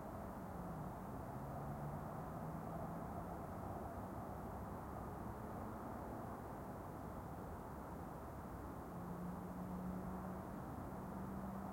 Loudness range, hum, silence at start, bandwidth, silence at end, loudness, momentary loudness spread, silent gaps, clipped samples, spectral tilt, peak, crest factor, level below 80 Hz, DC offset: 2 LU; none; 0 s; 16.5 kHz; 0 s; -49 LUFS; 3 LU; none; under 0.1%; -8 dB/octave; -34 dBFS; 14 dB; -60 dBFS; under 0.1%